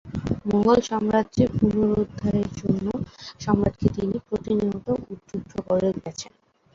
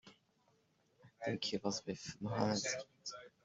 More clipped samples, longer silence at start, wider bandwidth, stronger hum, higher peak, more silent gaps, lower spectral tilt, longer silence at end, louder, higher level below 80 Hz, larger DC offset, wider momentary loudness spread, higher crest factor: neither; about the same, 0.05 s vs 0.05 s; about the same, 7.6 kHz vs 8 kHz; neither; first, -4 dBFS vs -20 dBFS; neither; first, -7.5 dB/octave vs -4 dB/octave; first, 0.5 s vs 0.15 s; first, -24 LUFS vs -41 LUFS; first, -44 dBFS vs -74 dBFS; neither; about the same, 13 LU vs 12 LU; about the same, 20 dB vs 24 dB